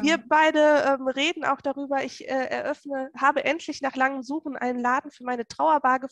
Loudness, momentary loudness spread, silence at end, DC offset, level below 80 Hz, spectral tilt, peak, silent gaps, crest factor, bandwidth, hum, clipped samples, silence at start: -24 LUFS; 12 LU; 0.05 s; under 0.1%; -70 dBFS; -3 dB/octave; -6 dBFS; none; 18 dB; 9.8 kHz; none; under 0.1%; 0 s